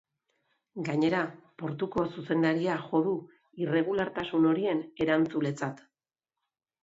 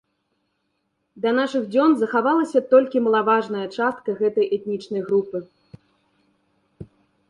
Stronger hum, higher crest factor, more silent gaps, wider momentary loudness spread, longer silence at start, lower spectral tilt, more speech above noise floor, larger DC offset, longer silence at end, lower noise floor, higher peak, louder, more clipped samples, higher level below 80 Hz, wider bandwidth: neither; about the same, 16 dB vs 18 dB; neither; about the same, 10 LU vs 10 LU; second, 0.75 s vs 1.15 s; about the same, -7 dB/octave vs -6.5 dB/octave; first, over 61 dB vs 53 dB; neither; first, 1.05 s vs 0.45 s; first, under -90 dBFS vs -73 dBFS; second, -14 dBFS vs -4 dBFS; second, -30 LUFS vs -21 LUFS; neither; about the same, -66 dBFS vs -66 dBFS; second, 7.8 kHz vs 10.5 kHz